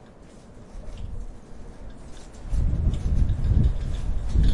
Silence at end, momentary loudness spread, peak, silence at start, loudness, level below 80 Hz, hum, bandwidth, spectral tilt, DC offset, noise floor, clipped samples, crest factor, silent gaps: 0 s; 22 LU; -8 dBFS; 0 s; -27 LUFS; -26 dBFS; none; 10.5 kHz; -8 dB/octave; under 0.1%; -46 dBFS; under 0.1%; 16 dB; none